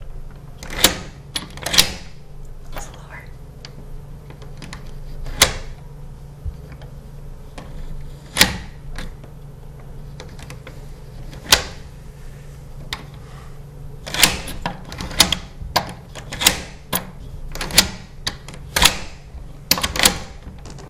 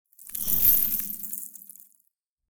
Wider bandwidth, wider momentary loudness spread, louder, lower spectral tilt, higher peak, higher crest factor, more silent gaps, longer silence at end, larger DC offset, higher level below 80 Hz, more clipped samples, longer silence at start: second, 15.5 kHz vs over 20 kHz; first, 24 LU vs 20 LU; first, -18 LUFS vs -22 LUFS; about the same, -1.5 dB/octave vs -1.5 dB/octave; first, 0 dBFS vs -6 dBFS; about the same, 24 dB vs 22 dB; second, none vs 2.28-2.37 s; about the same, 0 s vs 0.05 s; neither; first, -34 dBFS vs -52 dBFS; neither; about the same, 0 s vs 0.05 s